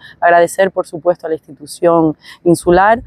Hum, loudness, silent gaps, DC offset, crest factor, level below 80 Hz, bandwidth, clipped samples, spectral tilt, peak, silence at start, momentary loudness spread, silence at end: none; -13 LUFS; none; under 0.1%; 14 dB; -42 dBFS; 14 kHz; under 0.1%; -6 dB/octave; 0 dBFS; 0.2 s; 11 LU; 0.05 s